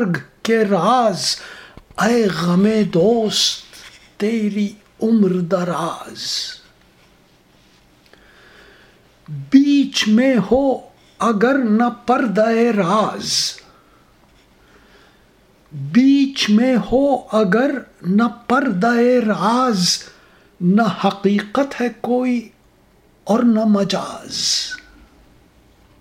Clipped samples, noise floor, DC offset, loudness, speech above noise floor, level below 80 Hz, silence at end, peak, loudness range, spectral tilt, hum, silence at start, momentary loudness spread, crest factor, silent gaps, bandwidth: under 0.1%; -53 dBFS; under 0.1%; -17 LUFS; 37 dB; -52 dBFS; 1.25 s; 0 dBFS; 6 LU; -5 dB/octave; none; 0 s; 11 LU; 18 dB; none; 16 kHz